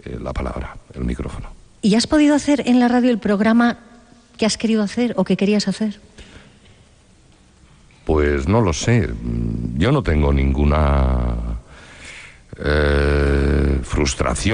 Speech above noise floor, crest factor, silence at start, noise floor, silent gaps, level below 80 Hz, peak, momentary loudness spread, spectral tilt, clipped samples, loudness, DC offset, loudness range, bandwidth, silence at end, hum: 33 dB; 14 dB; 0.05 s; -50 dBFS; none; -26 dBFS; -4 dBFS; 16 LU; -6 dB/octave; under 0.1%; -18 LUFS; under 0.1%; 6 LU; 10 kHz; 0 s; none